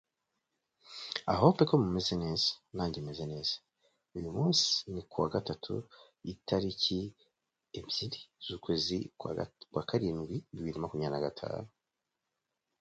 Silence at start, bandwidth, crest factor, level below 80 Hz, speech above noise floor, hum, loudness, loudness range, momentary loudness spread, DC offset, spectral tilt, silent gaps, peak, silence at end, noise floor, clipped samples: 0.85 s; 9 kHz; 26 dB; -58 dBFS; 54 dB; none; -33 LUFS; 6 LU; 16 LU; under 0.1%; -5 dB/octave; none; -10 dBFS; 1.15 s; -87 dBFS; under 0.1%